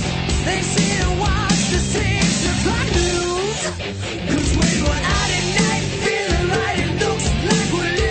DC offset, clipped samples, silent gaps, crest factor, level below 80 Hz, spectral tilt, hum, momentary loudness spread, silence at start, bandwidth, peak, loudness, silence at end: under 0.1%; under 0.1%; none; 16 dB; -28 dBFS; -4 dB/octave; none; 4 LU; 0 s; 9.2 kHz; -2 dBFS; -19 LUFS; 0 s